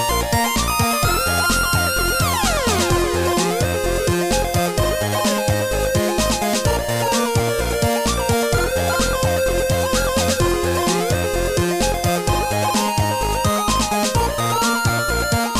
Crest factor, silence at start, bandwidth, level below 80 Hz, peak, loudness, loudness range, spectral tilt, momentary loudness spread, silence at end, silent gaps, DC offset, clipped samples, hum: 12 dB; 0 s; 16 kHz; -30 dBFS; -6 dBFS; -18 LUFS; 1 LU; -4 dB/octave; 2 LU; 0 s; none; under 0.1%; under 0.1%; none